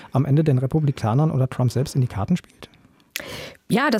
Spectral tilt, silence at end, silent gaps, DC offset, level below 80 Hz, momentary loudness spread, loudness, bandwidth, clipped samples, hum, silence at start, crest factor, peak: -7 dB/octave; 0 s; none; under 0.1%; -52 dBFS; 14 LU; -22 LUFS; 15.5 kHz; under 0.1%; none; 0 s; 18 dB; -4 dBFS